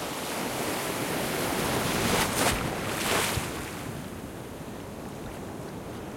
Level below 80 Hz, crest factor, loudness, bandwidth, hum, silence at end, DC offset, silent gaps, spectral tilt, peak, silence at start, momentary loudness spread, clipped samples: -48 dBFS; 20 dB; -30 LUFS; 16.5 kHz; none; 0 s; under 0.1%; none; -3.5 dB/octave; -12 dBFS; 0 s; 14 LU; under 0.1%